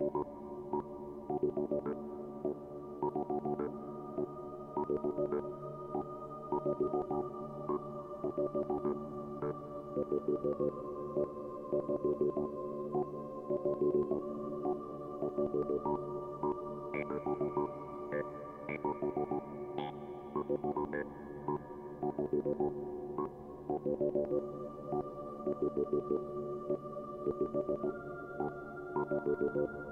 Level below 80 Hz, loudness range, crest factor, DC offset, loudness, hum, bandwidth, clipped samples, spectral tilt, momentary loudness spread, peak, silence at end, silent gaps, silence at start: -64 dBFS; 3 LU; 16 dB; under 0.1%; -38 LUFS; none; 3.8 kHz; under 0.1%; -9.5 dB/octave; 9 LU; -22 dBFS; 0 s; none; 0 s